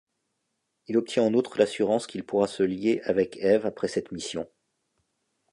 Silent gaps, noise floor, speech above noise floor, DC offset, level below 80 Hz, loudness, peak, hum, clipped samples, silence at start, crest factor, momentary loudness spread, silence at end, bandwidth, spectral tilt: none; -79 dBFS; 53 dB; under 0.1%; -64 dBFS; -26 LUFS; -8 dBFS; none; under 0.1%; 0.9 s; 20 dB; 10 LU; 1.05 s; 11 kHz; -5.5 dB/octave